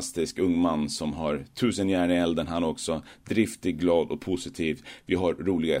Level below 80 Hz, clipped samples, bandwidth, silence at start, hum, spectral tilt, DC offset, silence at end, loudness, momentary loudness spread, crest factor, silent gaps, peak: -52 dBFS; under 0.1%; 16 kHz; 0 s; none; -5 dB/octave; under 0.1%; 0 s; -27 LUFS; 7 LU; 16 dB; none; -10 dBFS